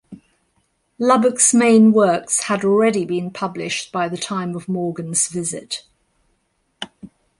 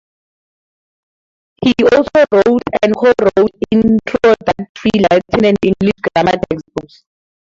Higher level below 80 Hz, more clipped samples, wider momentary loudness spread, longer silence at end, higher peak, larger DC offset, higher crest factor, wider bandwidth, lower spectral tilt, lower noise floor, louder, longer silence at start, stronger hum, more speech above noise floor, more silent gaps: second, -62 dBFS vs -42 dBFS; neither; first, 17 LU vs 8 LU; second, 0.35 s vs 0.75 s; about the same, -2 dBFS vs 0 dBFS; neither; about the same, 18 dB vs 14 dB; first, 11.5 kHz vs 7.6 kHz; second, -4 dB/octave vs -6.5 dB/octave; second, -67 dBFS vs under -90 dBFS; second, -17 LUFS vs -13 LUFS; second, 0.1 s vs 1.6 s; neither; second, 50 dB vs over 78 dB; second, none vs 4.69-4.75 s